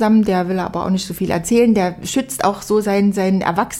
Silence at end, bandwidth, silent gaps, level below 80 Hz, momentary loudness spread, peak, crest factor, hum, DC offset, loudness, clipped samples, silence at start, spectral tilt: 0 s; 16.5 kHz; none; -44 dBFS; 7 LU; -4 dBFS; 14 dB; none; under 0.1%; -17 LUFS; under 0.1%; 0 s; -5.5 dB/octave